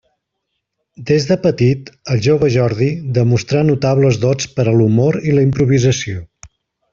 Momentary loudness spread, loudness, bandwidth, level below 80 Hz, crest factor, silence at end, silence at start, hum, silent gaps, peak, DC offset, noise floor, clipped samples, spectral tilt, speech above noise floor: 6 LU; -15 LUFS; 7.4 kHz; -46 dBFS; 14 dB; 0.45 s; 1 s; none; none; -2 dBFS; under 0.1%; -74 dBFS; under 0.1%; -6.5 dB/octave; 60 dB